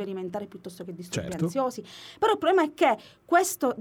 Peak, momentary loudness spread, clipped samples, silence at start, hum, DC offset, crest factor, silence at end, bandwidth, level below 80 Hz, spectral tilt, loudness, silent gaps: -8 dBFS; 18 LU; under 0.1%; 0 s; none; under 0.1%; 18 dB; 0 s; 20 kHz; -64 dBFS; -4.5 dB/octave; -26 LUFS; none